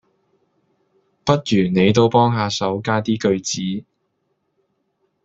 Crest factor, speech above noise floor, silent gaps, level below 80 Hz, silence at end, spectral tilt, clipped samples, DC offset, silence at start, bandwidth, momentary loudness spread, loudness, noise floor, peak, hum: 18 dB; 53 dB; none; -54 dBFS; 1.45 s; -5.5 dB/octave; under 0.1%; under 0.1%; 1.25 s; 8 kHz; 10 LU; -18 LUFS; -70 dBFS; -2 dBFS; none